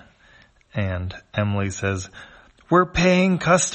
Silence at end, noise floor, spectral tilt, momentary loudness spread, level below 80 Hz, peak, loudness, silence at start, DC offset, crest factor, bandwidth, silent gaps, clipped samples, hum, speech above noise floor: 0 s; -54 dBFS; -5 dB/octave; 13 LU; -44 dBFS; -4 dBFS; -21 LUFS; 0.75 s; under 0.1%; 18 dB; 8.8 kHz; none; under 0.1%; none; 33 dB